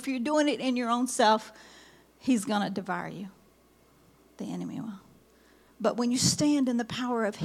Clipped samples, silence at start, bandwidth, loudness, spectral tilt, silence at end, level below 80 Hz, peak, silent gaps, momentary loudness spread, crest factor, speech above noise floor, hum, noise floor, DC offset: under 0.1%; 0 s; 15 kHz; -28 LUFS; -4 dB/octave; 0 s; -70 dBFS; -10 dBFS; none; 17 LU; 20 dB; 33 dB; none; -61 dBFS; under 0.1%